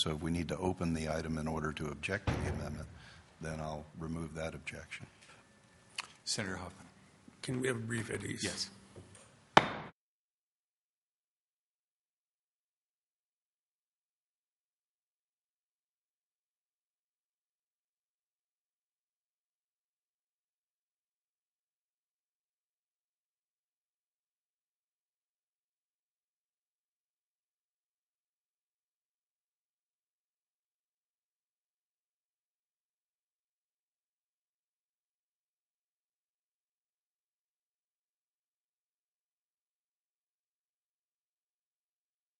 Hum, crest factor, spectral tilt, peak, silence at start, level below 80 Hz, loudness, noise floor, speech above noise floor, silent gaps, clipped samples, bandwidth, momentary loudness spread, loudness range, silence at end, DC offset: none; 40 dB; -4.5 dB/octave; -4 dBFS; 0 s; -62 dBFS; -37 LUFS; under -90 dBFS; over 52 dB; none; under 0.1%; 11.5 kHz; 16 LU; 8 LU; 32.5 s; under 0.1%